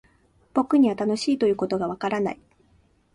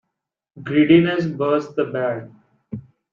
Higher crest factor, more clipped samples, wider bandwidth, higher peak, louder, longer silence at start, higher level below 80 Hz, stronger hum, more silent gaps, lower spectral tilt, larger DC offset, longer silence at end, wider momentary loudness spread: about the same, 16 dB vs 18 dB; neither; first, 11 kHz vs 7 kHz; second, -8 dBFS vs -2 dBFS; second, -24 LUFS vs -19 LUFS; about the same, 0.55 s vs 0.55 s; about the same, -62 dBFS vs -60 dBFS; neither; neither; second, -6 dB/octave vs -8 dB/octave; neither; first, 0.8 s vs 0.35 s; second, 8 LU vs 22 LU